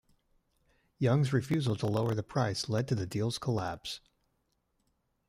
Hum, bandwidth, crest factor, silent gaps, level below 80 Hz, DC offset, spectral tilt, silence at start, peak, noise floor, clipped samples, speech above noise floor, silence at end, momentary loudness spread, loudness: none; 15 kHz; 18 dB; none; -64 dBFS; under 0.1%; -6 dB/octave; 1 s; -16 dBFS; -78 dBFS; under 0.1%; 47 dB; 1.3 s; 8 LU; -32 LUFS